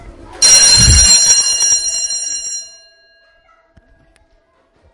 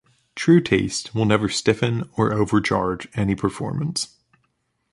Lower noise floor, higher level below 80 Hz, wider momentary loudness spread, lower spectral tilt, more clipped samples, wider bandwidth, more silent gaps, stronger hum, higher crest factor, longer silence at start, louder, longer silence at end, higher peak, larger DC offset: second, -55 dBFS vs -71 dBFS; first, -26 dBFS vs -48 dBFS; first, 15 LU vs 9 LU; second, 0 dB/octave vs -5.5 dB/octave; first, 0.2% vs under 0.1%; about the same, 12 kHz vs 11.5 kHz; neither; neither; about the same, 14 dB vs 18 dB; second, 0.05 s vs 0.35 s; first, -7 LUFS vs -21 LUFS; first, 2.25 s vs 0.85 s; about the same, 0 dBFS vs -2 dBFS; neither